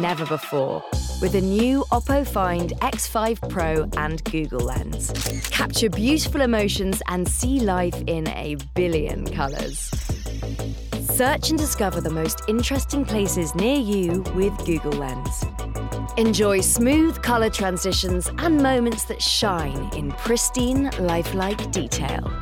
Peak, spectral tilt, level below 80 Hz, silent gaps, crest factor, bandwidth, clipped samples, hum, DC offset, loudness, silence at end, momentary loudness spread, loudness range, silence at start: -8 dBFS; -4.5 dB/octave; -32 dBFS; none; 14 dB; 19 kHz; under 0.1%; none; under 0.1%; -23 LUFS; 0 s; 8 LU; 4 LU; 0 s